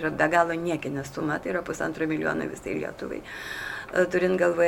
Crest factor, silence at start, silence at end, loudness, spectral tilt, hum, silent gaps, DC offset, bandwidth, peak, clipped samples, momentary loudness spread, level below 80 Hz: 20 dB; 0 s; 0 s; -27 LUFS; -5.5 dB/octave; none; none; under 0.1%; 17.5 kHz; -6 dBFS; under 0.1%; 11 LU; -54 dBFS